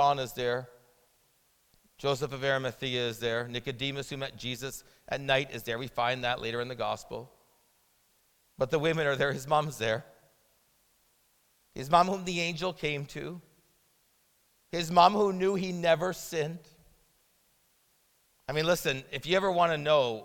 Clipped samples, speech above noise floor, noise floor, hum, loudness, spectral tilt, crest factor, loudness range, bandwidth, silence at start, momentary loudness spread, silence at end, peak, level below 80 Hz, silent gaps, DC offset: under 0.1%; 40 dB; -69 dBFS; none; -30 LUFS; -4.5 dB/octave; 24 dB; 5 LU; 18 kHz; 0 s; 13 LU; 0 s; -8 dBFS; -62 dBFS; none; under 0.1%